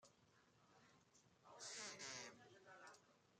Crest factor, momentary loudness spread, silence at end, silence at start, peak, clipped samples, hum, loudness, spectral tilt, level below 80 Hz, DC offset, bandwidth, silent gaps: 20 dB; 14 LU; 0 s; 0 s; -40 dBFS; under 0.1%; none; -55 LUFS; -1 dB/octave; under -90 dBFS; under 0.1%; 13 kHz; none